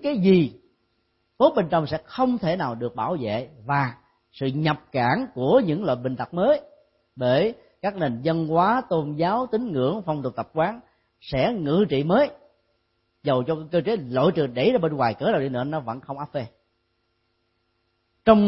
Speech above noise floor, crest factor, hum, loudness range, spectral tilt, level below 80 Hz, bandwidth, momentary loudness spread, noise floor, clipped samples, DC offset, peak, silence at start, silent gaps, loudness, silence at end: 49 dB; 20 dB; none; 2 LU; -11.5 dB/octave; -56 dBFS; 5.8 kHz; 10 LU; -72 dBFS; under 0.1%; under 0.1%; -2 dBFS; 0 s; none; -24 LUFS; 0 s